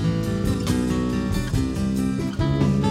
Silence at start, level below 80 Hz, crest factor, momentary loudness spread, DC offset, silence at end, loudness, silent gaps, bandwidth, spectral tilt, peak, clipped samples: 0 s; -34 dBFS; 14 dB; 3 LU; under 0.1%; 0 s; -23 LUFS; none; 16 kHz; -7 dB/octave; -8 dBFS; under 0.1%